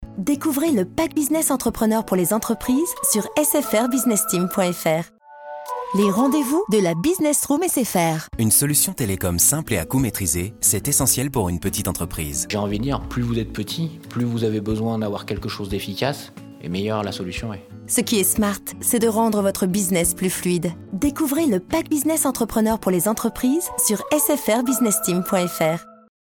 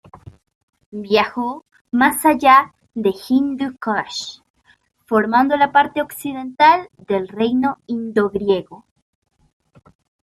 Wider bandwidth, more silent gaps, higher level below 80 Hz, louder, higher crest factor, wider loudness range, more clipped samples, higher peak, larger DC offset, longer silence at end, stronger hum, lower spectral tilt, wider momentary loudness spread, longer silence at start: first, 19.5 kHz vs 15 kHz; second, none vs 0.55-0.68 s, 0.86-0.92 s, 1.81-1.85 s, 4.50-4.54 s; first, -44 dBFS vs -58 dBFS; about the same, -20 LUFS vs -18 LUFS; about the same, 16 dB vs 18 dB; first, 6 LU vs 3 LU; neither; second, -6 dBFS vs -2 dBFS; neither; second, 0.35 s vs 1.45 s; neither; about the same, -4 dB/octave vs -4.5 dB/octave; second, 9 LU vs 14 LU; second, 0 s vs 0.15 s